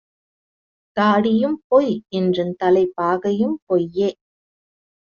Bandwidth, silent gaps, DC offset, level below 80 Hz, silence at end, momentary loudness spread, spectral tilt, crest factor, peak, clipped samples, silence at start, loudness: 7 kHz; 1.64-1.70 s, 3.62-3.67 s; under 0.1%; -62 dBFS; 1 s; 6 LU; -5.5 dB/octave; 16 dB; -4 dBFS; under 0.1%; 0.95 s; -19 LUFS